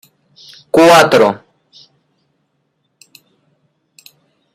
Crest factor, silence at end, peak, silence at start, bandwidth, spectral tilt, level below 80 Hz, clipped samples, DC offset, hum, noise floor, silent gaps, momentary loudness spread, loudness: 16 dB; 3.2 s; 0 dBFS; 0.75 s; 16 kHz; -4 dB/octave; -56 dBFS; under 0.1%; under 0.1%; none; -66 dBFS; none; 11 LU; -9 LUFS